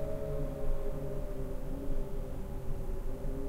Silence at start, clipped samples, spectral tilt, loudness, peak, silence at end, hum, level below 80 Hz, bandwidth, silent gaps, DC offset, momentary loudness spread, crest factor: 0 s; under 0.1%; -8 dB/octave; -41 LUFS; -20 dBFS; 0 s; none; -36 dBFS; 15 kHz; none; under 0.1%; 4 LU; 12 dB